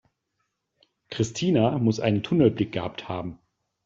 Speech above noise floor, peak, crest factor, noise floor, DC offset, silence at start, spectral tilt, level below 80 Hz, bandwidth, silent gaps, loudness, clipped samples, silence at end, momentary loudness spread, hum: 54 dB; -6 dBFS; 20 dB; -78 dBFS; under 0.1%; 1.1 s; -6.5 dB/octave; -58 dBFS; 7.8 kHz; none; -25 LUFS; under 0.1%; 0.5 s; 12 LU; none